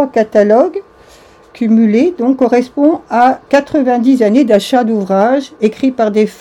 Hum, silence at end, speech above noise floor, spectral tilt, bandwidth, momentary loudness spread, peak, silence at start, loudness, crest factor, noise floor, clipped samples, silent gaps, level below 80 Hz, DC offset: none; 0.05 s; 31 dB; -6.5 dB/octave; 12.5 kHz; 5 LU; 0 dBFS; 0 s; -11 LUFS; 12 dB; -41 dBFS; 0.4%; none; -52 dBFS; under 0.1%